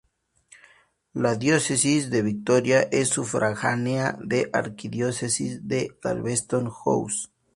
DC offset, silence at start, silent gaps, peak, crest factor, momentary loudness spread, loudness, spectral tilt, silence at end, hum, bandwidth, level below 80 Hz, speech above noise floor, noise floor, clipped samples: under 0.1%; 1.15 s; none; -6 dBFS; 20 dB; 8 LU; -24 LUFS; -4.5 dB/octave; 0.3 s; none; 11.5 kHz; -60 dBFS; 35 dB; -59 dBFS; under 0.1%